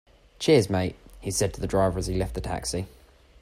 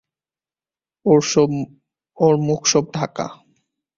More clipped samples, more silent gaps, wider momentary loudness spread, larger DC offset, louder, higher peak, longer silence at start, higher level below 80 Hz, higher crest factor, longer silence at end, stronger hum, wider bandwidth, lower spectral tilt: neither; neither; about the same, 12 LU vs 13 LU; neither; second, -26 LUFS vs -18 LUFS; second, -8 dBFS vs -2 dBFS; second, 0.4 s vs 1.05 s; first, -42 dBFS vs -58 dBFS; about the same, 20 dB vs 18 dB; about the same, 0.55 s vs 0.65 s; neither; first, 16 kHz vs 7.6 kHz; about the same, -5 dB/octave vs -4.5 dB/octave